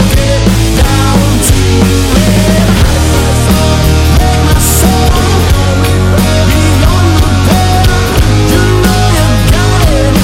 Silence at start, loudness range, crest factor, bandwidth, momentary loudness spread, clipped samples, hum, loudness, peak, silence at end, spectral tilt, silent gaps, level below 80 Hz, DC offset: 0 s; 0 LU; 6 dB; 16.5 kHz; 1 LU; 0.3%; none; -8 LUFS; 0 dBFS; 0 s; -5 dB/octave; none; -12 dBFS; under 0.1%